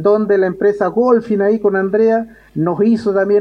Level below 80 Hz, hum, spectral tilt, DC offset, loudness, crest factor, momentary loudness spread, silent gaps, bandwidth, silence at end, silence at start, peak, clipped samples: -54 dBFS; none; -9 dB/octave; under 0.1%; -15 LUFS; 12 dB; 6 LU; none; 6.4 kHz; 0 s; 0 s; -2 dBFS; under 0.1%